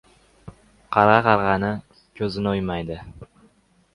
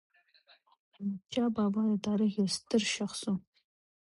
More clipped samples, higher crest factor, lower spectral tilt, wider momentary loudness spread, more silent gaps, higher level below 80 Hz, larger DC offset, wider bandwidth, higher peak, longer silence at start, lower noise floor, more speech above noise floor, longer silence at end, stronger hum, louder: neither; about the same, 22 dB vs 18 dB; first, -7.5 dB/octave vs -5 dB/octave; first, 18 LU vs 9 LU; neither; first, -48 dBFS vs -70 dBFS; neither; about the same, 11 kHz vs 11.5 kHz; first, 0 dBFS vs -16 dBFS; second, 0.45 s vs 1 s; second, -59 dBFS vs -65 dBFS; first, 38 dB vs 34 dB; about the same, 0.7 s vs 0.7 s; neither; first, -21 LUFS vs -32 LUFS